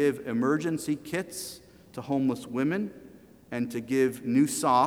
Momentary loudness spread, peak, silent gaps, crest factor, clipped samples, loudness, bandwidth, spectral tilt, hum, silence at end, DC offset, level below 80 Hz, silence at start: 13 LU; -12 dBFS; none; 16 dB; under 0.1%; -29 LUFS; 18 kHz; -5.5 dB/octave; none; 0 s; under 0.1%; -66 dBFS; 0 s